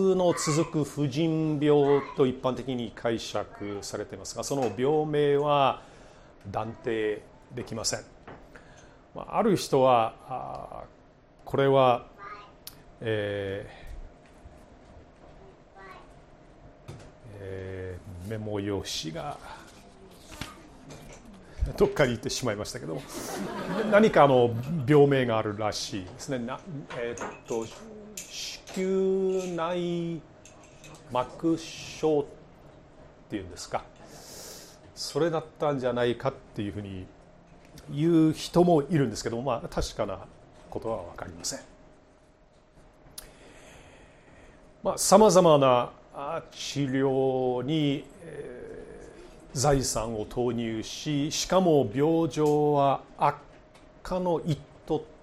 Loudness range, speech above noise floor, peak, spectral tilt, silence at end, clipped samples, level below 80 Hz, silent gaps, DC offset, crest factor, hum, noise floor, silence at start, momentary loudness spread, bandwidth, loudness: 13 LU; 32 dB; -4 dBFS; -5.5 dB/octave; 0.1 s; under 0.1%; -50 dBFS; none; under 0.1%; 24 dB; none; -59 dBFS; 0 s; 22 LU; 14 kHz; -27 LUFS